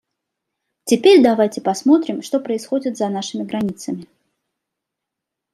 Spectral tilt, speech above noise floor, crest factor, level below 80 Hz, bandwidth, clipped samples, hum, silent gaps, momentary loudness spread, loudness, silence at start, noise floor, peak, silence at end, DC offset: -5 dB/octave; 65 dB; 18 dB; -66 dBFS; 14 kHz; under 0.1%; none; none; 15 LU; -17 LUFS; 0.85 s; -82 dBFS; -2 dBFS; 1.5 s; under 0.1%